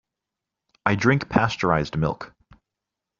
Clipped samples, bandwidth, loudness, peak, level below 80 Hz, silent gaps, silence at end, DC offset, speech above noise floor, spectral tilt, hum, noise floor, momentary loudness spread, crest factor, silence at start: under 0.1%; 7.4 kHz; -22 LUFS; -4 dBFS; -48 dBFS; none; 0.9 s; under 0.1%; 64 dB; -5 dB/octave; none; -86 dBFS; 10 LU; 22 dB; 0.85 s